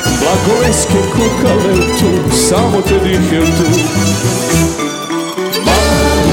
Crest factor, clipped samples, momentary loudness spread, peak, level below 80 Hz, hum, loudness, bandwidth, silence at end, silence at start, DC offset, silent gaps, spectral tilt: 12 dB; under 0.1%; 5 LU; 0 dBFS; -24 dBFS; none; -11 LUFS; 17.5 kHz; 0 s; 0 s; under 0.1%; none; -4.5 dB/octave